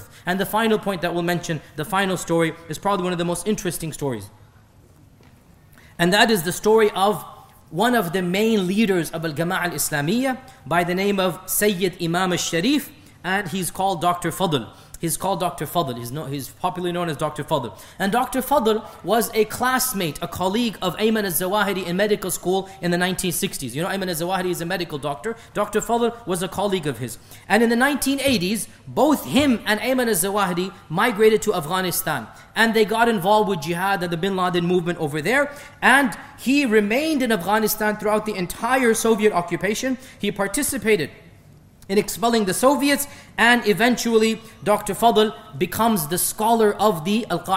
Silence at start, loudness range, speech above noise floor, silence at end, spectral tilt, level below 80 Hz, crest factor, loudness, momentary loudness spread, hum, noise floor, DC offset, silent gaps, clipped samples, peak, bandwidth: 0 s; 5 LU; 30 dB; 0 s; -4 dB/octave; -50 dBFS; 20 dB; -21 LUFS; 9 LU; none; -51 dBFS; under 0.1%; none; under 0.1%; -2 dBFS; 16.5 kHz